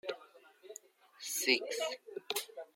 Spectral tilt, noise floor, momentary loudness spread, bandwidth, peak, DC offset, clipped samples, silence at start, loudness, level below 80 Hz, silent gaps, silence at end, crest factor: 0.5 dB/octave; -60 dBFS; 22 LU; 16.5 kHz; -14 dBFS; under 0.1%; under 0.1%; 0.05 s; -36 LUFS; under -90 dBFS; none; 0.1 s; 26 dB